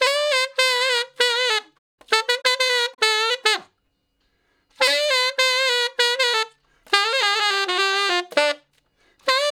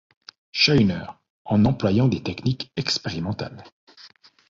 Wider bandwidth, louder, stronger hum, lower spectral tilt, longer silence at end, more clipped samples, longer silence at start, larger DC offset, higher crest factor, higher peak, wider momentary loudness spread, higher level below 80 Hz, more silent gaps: first, 18.5 kHz vs 7.6 kHz; first, -19 LUFS vs -22 LUFS; neither; second, 2 dB/octave vs -5.5 dB/octave; second, 0.1 s vs 0.4 s; neither; second, 0 s vs 0.55 s; neither; about the same, 22 dB vs 20 dB; about the same, 0 dBFS vs -2 dBFS; second, 4 LU vs 14 LU; second, -76 dBFS vs -48 dBFS; second, 1.78-1.98 s vs 1.30-1.45 s, 3.72-3.87 s